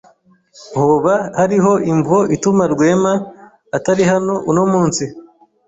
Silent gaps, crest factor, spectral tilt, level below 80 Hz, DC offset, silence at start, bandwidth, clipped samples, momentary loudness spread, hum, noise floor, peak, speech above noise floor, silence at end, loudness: none; 14 dB; -6 dB/octave; -52 dBFS; under 0.1%; 0.6 s; 8 kHz; under 0.1%; 8 LU; none; -51 dBFS; -2 dBFS; 37 dB; 0.45 s; -15 LUFS